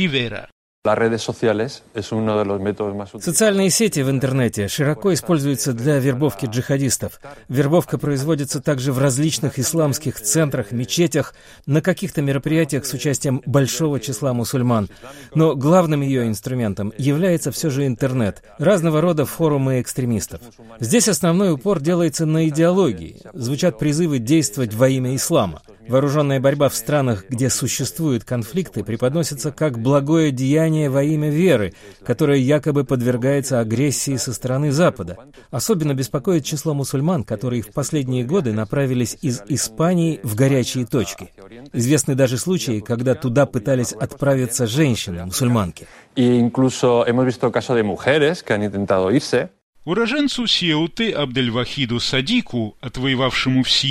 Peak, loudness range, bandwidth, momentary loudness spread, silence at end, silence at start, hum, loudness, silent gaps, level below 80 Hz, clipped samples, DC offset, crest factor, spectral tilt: -2 dBFS; 2 LU; 16 kHz; 8 LU; 0 s; 0 s; none; -19 LUFS; 0.52-0.82 s, 49.63-49.73 s; -48 dBFS; under 0.1%; under 0.1%; 16 dB; -5 dB/octave